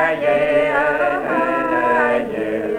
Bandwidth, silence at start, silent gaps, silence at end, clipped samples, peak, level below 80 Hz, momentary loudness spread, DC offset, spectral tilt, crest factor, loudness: 11 kHz; 0 s; none; 0 s; under 0.1%; -4 dBFS; -50 dBFS; 4 LU; under 0.1%; -6 dB/octave; 14 dB; -17 LUFS